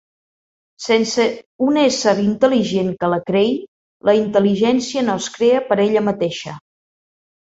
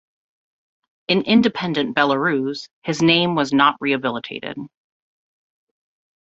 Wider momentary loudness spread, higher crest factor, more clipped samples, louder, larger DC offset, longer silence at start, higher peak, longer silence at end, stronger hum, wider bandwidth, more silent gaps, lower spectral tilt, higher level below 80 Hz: second, 7 LU vs 14 LU; about the same, 16 dB vs 20 dB; neither; about the same, -17 LUFS vs -19 LUFS; neither; second, 0.8 s vs 1.1 s; about the same, -2 dBFS vs 0 dBFS; second, 0.9 s vs 1.55 s; neither; about the same, 8 kHz vs 8 kHz; first, 1.46-1.59 s, 3.68-4.00 s vs 2.73-2.82 s; about the same, -5 dB/octave vs -5 dB/octave; about the same, -58 dBFS vs -60 dBFS